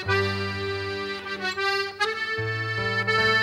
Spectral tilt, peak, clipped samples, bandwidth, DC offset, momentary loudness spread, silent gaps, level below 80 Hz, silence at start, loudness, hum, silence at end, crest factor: -4.5 dB/octave; -10 dBFS; under 0.1%; 15.5 kHz; under 0.1%; 7 LU; none; -56 dBFS; 0 s; -26 LUFS; none; 0 s; 16 dB